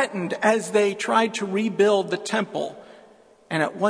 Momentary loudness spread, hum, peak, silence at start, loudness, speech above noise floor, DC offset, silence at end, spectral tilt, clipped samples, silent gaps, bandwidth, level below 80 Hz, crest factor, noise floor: 9 LU; none; -4 dBFS; 0 s; -23 LUFS; 30 dB; under 0.1%; 0 s; -4.5 dB/octave; under 0.1%; none; 11 kHz; -74 dBFS; 20 dB; -53 dBFS